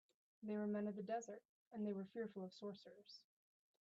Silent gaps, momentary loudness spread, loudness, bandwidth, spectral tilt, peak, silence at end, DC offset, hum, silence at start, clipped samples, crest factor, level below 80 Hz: 1.45-1.71 s; 16 LU; -49 LUFS; 7.8 kHz; -6.5 dB/octave; -36 dBFS; 0.6 s; under 0.1%; none; 0.4 s; under 0.1%; 14 dB; under -90 dBFS